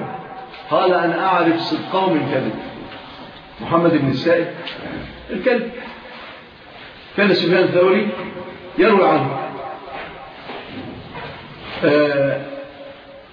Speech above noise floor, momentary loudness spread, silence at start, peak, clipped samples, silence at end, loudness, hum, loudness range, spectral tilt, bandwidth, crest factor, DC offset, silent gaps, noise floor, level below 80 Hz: 23 dB; 20 LU; 0 s; -2 dBFS; under 0.1%; 0.05 s; -18 LUFS; none; 5 LU; -8 dB/octave; 5.4 kHz; 18 dB; under 0.1%; none; -40 dBFS; -52 dBFS